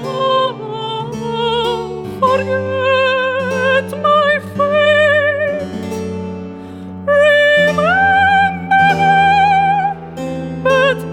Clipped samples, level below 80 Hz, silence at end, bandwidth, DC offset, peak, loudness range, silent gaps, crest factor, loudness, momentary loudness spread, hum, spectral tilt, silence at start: under 0.1%; -48 dBFS; 0 s; 14 kHz; under 0.1%; -2 dBFS; 5 LU; none; 12 dB; -14 LUFS; 13 LU; none; -5 dB/octave; 0 s